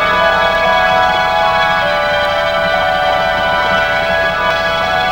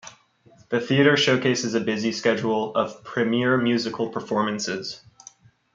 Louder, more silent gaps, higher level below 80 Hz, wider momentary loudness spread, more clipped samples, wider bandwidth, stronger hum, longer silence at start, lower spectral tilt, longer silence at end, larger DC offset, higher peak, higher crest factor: first, -12 LUFS vs -23 LUFS; neither; first, -34 dBFS vs -66 dBFS; second, 2 LU vs 10 LU; neither; first, over 20 kHz vs 7.6 kHz; neither; about the same, 0 s vs 0.05 s; about the same, -3.5 dB/octave vs -4.5 dB/octave; second, 0 s vs 0.75 s; neither; first, 0 dBFS vs -4 dBFS; second, 12 dB vs 20 dB